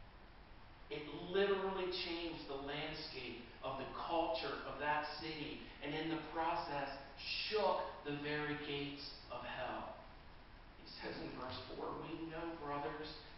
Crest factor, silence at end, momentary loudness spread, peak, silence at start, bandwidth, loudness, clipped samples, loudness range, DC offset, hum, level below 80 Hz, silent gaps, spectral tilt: 20 dB; 0 s; 16 LU; -24 dBFS; 0 s; 5.8 kHz; -43 LUFS; under 0.1%; 7 LU; under 0.1%; none; -62 dBFS; none; -2.5 dB/octave